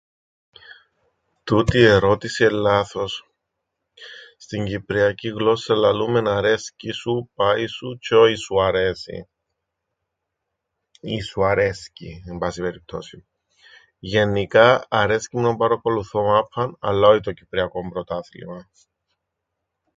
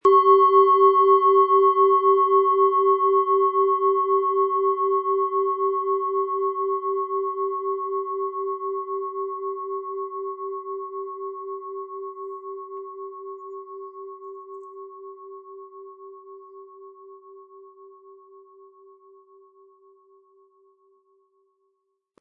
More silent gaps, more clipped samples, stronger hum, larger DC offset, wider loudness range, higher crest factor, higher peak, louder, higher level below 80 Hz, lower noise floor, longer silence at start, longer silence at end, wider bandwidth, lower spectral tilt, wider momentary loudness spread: neither; neither; neither; neither; second, 7 LU vs 23 LU; about the same, 22 dB vs 18 dB; first, 0 dBFS vs -6 dBFS; about the same, -20 LUFS vs -21 LUFS; first, -46 dBFS vs -84 dBFS; first, -80 dBFS vs -75 dBFS; first, 0.7 s vs 0.05 s; second, 1.35 s vs 4.35 s; first, 9.2 kHz vs 3.3 kHz; about the same, -5.5 dB/octave vs -6 dB/octave; second, 20 LU vs 24 LU